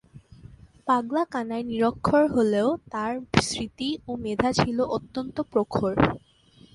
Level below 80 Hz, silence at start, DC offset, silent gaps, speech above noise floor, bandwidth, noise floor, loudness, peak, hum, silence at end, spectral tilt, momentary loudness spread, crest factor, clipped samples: -48 dBFS; 0.15 s; under 0.1%; none; 30 dB; 11.5 kHz; -55 dBFS; -25 LUFS; -2 dBFS; none; 0.55 s; -5.5 dB/octave; 9 LU; 24 dB; under 0.1%